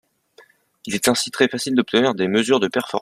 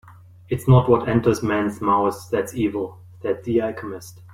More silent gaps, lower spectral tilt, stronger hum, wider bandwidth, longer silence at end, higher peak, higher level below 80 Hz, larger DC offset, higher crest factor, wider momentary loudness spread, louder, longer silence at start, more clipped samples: neither; second, -3.5 dB/octave vs -7.5 dB/octave; neither; about the same, 15 kHz vs 15.5 kHz; about the same, 0 s vs 0 s; about the same, -2 dBFS vs -2 dBFS; second, -62 dBFS vs -46 dBFS; neither; about the same, 20 dB vs 18 dB; second, 4 LU vs 15 LU; about the same, -19 LUFS vs -21 LUFS; first, 0.85 s vs 0.05 s; neither